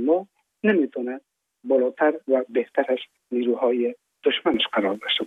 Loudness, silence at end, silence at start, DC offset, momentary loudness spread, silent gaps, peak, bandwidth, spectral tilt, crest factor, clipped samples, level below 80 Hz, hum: -24 LUFS; 0 s; 0 s; under 0.1%; 8 LU; none; -6 dBFS; 4.4 kHz; -6.5 dB/octave; 16 dB; under 0.1%; -70 dBFS; none